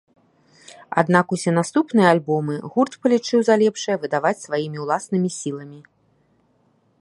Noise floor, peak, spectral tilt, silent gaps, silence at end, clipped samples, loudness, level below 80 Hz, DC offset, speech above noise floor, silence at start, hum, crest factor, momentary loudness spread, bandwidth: -62 dBFS; 0 dBFS; -5.5 dB/octave; none; 1.2 s; under 0.1%; -20 LUFS; -70 dBFS; under 0.1%; 42 dB; 0.7 s; none; 20 dB; 9 LU; 11.5 kHz